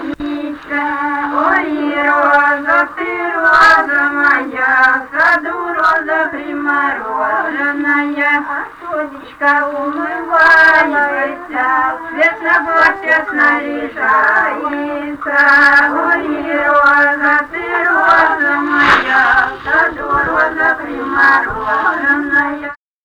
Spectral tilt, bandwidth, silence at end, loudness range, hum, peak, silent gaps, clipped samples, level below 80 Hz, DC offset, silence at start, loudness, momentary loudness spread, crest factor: -4 dB/octave; 13.5 kHz; 0.3 s; 4 LU; none; -2 dBFS; none; under 0.1%; -46 dBFS; under 0.1%; 0 s; -12 LUFS; 11 LU; 12 dB